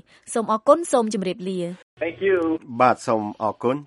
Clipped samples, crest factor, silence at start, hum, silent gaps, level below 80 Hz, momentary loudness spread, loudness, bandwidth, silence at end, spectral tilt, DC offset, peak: under 0.1%; 20 dB; 0.25 s; none; 1.83-1.97 s; -64 dBFS; 11 LU; -22 LUFS; 11.5 kHz; 0 s; -5.5 dB/octave; under 0.1%; -2 dBFS